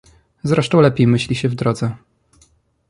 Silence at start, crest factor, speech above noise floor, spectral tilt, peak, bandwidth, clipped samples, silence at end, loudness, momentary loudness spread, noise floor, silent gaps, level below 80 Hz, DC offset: 0.45 s; 16 dB; 41 dB; -7 dB/octave; -2 dBFS; 11.5 kHz; under 0.1%; 0.95 s; -17 LUFS; 13 LU; -56 dBFS; none; -48 dBFS; under 0.1%